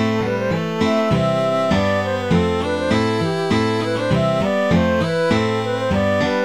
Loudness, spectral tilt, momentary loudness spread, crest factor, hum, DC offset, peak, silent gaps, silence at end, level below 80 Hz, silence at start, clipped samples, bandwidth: -18 LUFS; -6.5 dB/octave; 3 LU; 14 dB; none; 0.5%; -4 dBFS; none; 0 s; -40 dBFS; 0 s; under 0.1%; 15 kHz